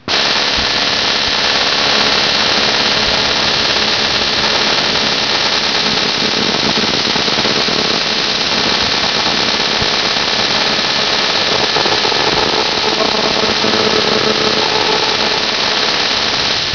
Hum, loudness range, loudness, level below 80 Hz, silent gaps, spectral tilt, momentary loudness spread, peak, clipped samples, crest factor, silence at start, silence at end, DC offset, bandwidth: none; 1 LU; -11 LUFS; -40 dBFS; none; -2 dB/octave; 2 LU; 0 dBFS; under 0.1%; 14 dB; 0.05 s; 0 s; 0.4%; 5.4 kHz